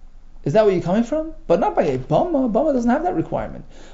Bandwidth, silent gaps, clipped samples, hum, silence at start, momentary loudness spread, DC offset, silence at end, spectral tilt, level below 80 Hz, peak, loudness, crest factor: 7.8 kHz; none; under 0.1%; none; 0 s; 10 LU; under 0.1%; 0 s; -7.5 dB/octave; -38 dBFS; -4 dBFS; -20 LUFS; 16 dB